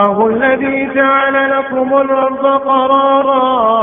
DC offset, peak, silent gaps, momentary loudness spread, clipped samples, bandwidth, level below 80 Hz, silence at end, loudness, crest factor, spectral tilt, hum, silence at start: under 0.1%; 0 dBFS; none; 4 LU; under 0.1%; 3.8 kHz; -52 dBFS; 0 s; -12 LUFS; 12 dB; -8.5 dB/octave; none; 0 s